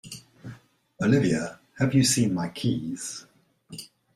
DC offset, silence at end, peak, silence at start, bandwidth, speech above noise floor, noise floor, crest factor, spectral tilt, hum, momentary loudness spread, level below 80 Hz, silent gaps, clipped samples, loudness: under 0.1%; 0.3 s; -8 dBFS; 0.05 s; 14.5 kHz; 27 dB; -51 dBFS; 18 dB; -5 dB/octave; none; 22 LU; -60 dBFS; none; under 0.1%; -25 LUFS